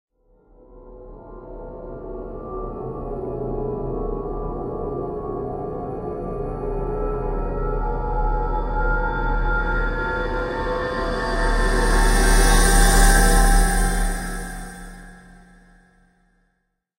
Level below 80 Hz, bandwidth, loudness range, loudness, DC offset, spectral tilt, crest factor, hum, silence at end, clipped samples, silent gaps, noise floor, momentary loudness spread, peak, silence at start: -24 dBFS; 16 kHz; 12 LU; -23 LUFS; under 0.1%; -4 dB/octave; 18 dB; none; 1.8 s; under 0.1%; none; -72 dBFS; 19 LU; -4 dBFS; 0.7 s